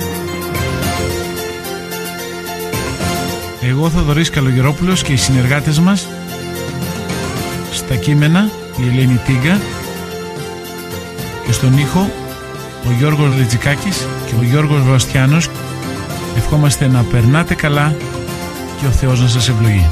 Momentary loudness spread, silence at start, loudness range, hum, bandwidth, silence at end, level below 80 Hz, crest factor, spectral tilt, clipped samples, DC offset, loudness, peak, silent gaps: 12 LU; 0 s; 4 LU; none; 15.5 kHz; 0 s; -30 dBFS; 12 dB; -5.5 dB/octave; under 0.1%; under 0.1%; -15 LUFS; -2 dBFS; none